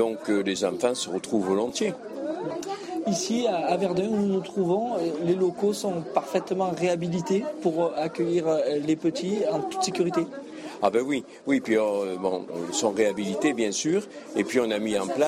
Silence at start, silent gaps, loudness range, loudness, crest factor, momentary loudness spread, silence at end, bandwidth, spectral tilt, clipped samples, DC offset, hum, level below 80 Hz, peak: 0 s; none; 1 LU; -26 LUFS; 18 dB; 6 LU; 0 s; 15 kHz; -5 dB/octave; under 0.1%; under 0.1%; none; -68 dBFS; -8 dBFS